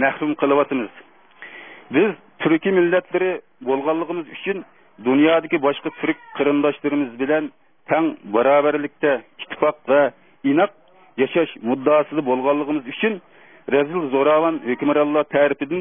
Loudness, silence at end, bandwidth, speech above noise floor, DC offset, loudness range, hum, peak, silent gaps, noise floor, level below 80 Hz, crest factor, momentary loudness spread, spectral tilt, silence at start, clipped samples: -20 LUFS; 0 s; 3.7 kHz; 24 dB; 0.2%; 1 LU; none; -4 dBFS; none; -44 dBFS; -70 dBFS; 16 dB; 10 LU; -10 dB/octave; 0 s; under 0.1%